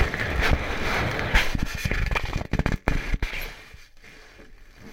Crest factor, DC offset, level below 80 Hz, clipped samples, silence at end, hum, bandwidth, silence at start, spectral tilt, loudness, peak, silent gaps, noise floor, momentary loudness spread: 26 dB; under 0.1%; -30 dBFS; under 0.1%; 0 s; none; 16.5 kHz; 0 s; -5 dB/octave; -26 LUFS; 0 dBFS; none; -47 dBFS; 12 LU